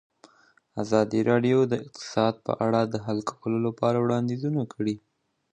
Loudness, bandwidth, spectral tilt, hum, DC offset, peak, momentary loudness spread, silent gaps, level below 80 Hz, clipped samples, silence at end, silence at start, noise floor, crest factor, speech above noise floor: -26 LUFS; 9.2 kHz; -7 dB/octave; none; under 0.1%; -6 dBFS; 8 LU; none; -64 dBFS; under 0.1%; 0.55 s; 0.75 s; -61 dBFS; 20 dB; 36 dB